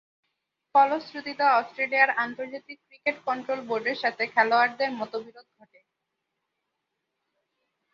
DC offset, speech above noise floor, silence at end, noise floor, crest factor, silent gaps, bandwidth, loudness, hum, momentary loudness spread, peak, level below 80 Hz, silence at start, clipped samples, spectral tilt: under 0.1%; 56 dB; 2.5 s; -82 dBFS; 22 dB; none; 7.2 kHz; -25 LUFS; none; 15 LU; -6 dBFS; -80 dBFS; 0.75 s; under 0.1%; -4.5 dB/octave